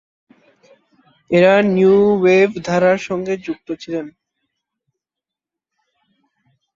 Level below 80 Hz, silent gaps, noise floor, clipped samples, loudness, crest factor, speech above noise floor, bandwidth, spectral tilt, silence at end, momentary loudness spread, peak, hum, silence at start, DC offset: -58 dBFS; none; -86 dBFS; under 0.1%; -15 LUFS; 16 dB; 72 dB; 7.4 kHz; -6.5 dB/octave; 2.65 s; 15 LU; -2 dBFS; none; 1.3 s; under 0.1%